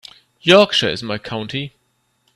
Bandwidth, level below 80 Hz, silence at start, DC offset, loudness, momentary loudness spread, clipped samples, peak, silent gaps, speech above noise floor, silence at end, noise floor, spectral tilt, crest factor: 12.5 kHz; -56 dBFS; 0.45 s; under 0.1%; -16 LUFS; 15 LU; under 0.1%; 0 dBFS; none; 49 dB; 0.7 s; -66 dBFS; -4.5 dB/octave; 18 dB